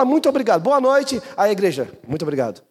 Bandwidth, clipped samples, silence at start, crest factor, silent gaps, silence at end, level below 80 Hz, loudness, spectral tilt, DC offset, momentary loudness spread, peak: 14.5 kHz; under 0.1%; 0 s; 14 dB; none; 0.15 s; -60 dBFS; -19 LUFS; -5.5 dB/octave; under 0.1%; 10 LU; -4 dBFS